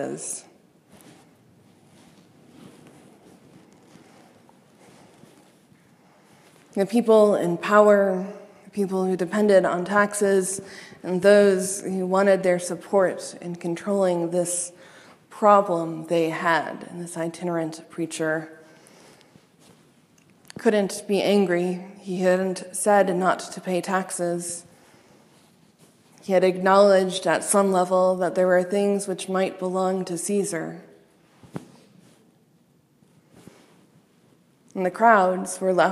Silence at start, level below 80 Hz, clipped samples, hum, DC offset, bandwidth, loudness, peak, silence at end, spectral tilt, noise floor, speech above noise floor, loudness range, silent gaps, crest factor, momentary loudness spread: 0 s; -76 dBFS; under 0.1%; none; under 0.1%; 14.5 kHz; -22 LUFS; -2 dBFS; 0 s; -5 dB/octave; -61 dBFS; 39 dB; 11 LU; none; 22 dB; 16 LU